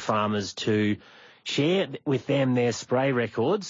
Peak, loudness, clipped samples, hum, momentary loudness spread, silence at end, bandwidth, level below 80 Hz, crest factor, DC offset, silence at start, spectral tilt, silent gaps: -12 dBFS; -26 LUFS; under 0.1%; none; 5 LU; 0 s; 7.8 kHz; -68 dBFS; 14 dB; under 0.1%; 0 s; -5.5 dB/octave; none